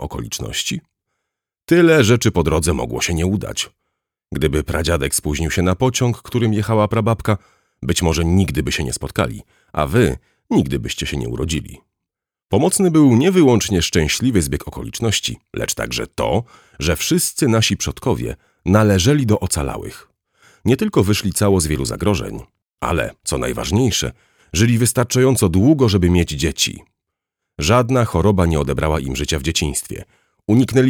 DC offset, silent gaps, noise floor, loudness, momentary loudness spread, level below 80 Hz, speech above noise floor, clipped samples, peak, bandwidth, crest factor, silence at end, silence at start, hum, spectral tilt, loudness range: under 0.1%; 22.70-22.74 s; -84 dBFS; -17 LUFS; 11 LU; -34 dBFS; 67 dB; under 0.1%; -2 dBFS; 19 kHz; 16 dB; 0 s; 0 s; none; -5 dB/octave; 4 LU